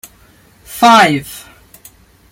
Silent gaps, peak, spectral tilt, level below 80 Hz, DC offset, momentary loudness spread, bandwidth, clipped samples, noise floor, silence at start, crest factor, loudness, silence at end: none; 0 dBFS; -3.5 dB/octave; -50 dBFS; under 0.1%; 23 LU; 17 kHz; under 0.1%; -47 dBFS; 0.7 s; 14 dB; -10 LUFS; 0.95 s